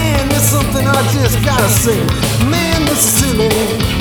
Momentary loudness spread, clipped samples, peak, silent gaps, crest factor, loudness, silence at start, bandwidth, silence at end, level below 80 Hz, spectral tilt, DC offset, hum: 4 LU; under 0.1%; 0 dBFS; none; 12 dB; -12 LUFS; 0 s; over 20 kHz; 0 s; -24 dBFS; -4 dB/octave; under 0.1%; none